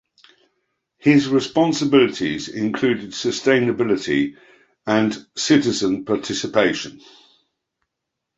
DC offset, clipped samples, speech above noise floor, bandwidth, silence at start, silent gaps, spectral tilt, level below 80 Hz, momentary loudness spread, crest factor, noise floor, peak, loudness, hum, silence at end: under 0.1%; under 0.1%; 62 dB; 8 kHz; 1.05 s; none; -4.5 dB/octave; -58 dBFS; 8 LU; 18 dB; -81 dBFS; -2 dBFS; -19 LUFS; none; 1.4 s